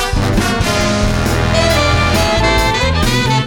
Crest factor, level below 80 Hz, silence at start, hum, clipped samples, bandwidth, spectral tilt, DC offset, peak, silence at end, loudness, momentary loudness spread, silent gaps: 12 dB; -20 dBFS; 0 s; none; under 0.1%; 18 kHz; -4.5 dB/octave; under 0.1%; 0 dBFS; 0 s; -13 LUFS; 3 LU; none